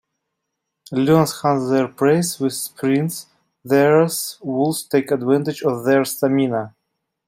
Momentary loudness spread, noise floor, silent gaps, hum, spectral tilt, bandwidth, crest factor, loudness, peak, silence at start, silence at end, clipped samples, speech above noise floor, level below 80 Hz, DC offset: 9 LU; -78 dBFS; none; none; -5.5 dB/octave; 16.5 kHz; 16 dB; -19 LUFS; -2 dBFS; 0.9 s; 0.6 s; under 0.1%; 60 dB; -62 dBFS; under 0.1%